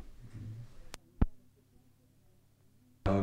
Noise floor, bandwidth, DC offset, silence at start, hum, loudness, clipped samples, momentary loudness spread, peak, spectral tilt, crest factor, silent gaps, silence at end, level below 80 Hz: -65 dBFS; 14.5 kHz; under 0.1%; 0 s; none; -40 LUFS; under 0.1%; 17 LU; -10 dBFS; -8 dB/octave; 28 dB; none; 0 s; -44 dBFS